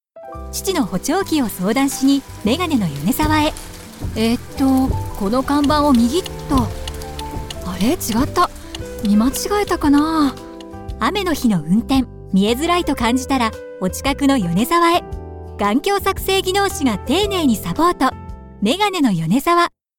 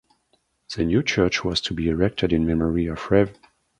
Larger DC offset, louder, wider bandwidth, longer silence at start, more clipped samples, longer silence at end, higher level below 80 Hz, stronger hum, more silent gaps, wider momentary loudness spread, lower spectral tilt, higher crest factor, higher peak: neither; first, -18 LUFS vs -22 LUFS; first, 19 kHz vs 10.5 kHz; second, 0.15 s vs 0.7 s; neither; second, 0.3 s vs 0.45 s; first, -34 dBFS vs -40 dBFS; neither; neither; first, 13 LU vs 5 LU; about the same, -5 dB/octave vs -6 dB/octave; second, 14 dB vs 20 dB; about the same, -4 dBFS vs -4 dBFS